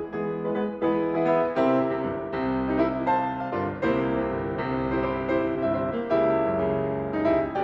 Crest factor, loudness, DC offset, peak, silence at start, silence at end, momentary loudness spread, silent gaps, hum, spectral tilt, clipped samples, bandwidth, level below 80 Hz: 14 dB; -26 LUFS; under 0.1%; -12 dBFS; 0 s; 0 s; 6 LU; none; none; -9 dB/octave; under 0.1%; 5.8 kHz; -48 dBFS